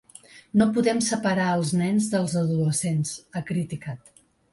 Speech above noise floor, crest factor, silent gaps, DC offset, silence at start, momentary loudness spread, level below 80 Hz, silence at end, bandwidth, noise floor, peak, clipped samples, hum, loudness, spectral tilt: 26 dB; 16 dB; none; under 0.1%; 0.35 s; 11 LU; -60 dBFS; 0.55 s; 11.5 kHz; -50 dBFS; -8 dBFS; under 0.1%; none; -24 LUFS; -5.5 dB/octave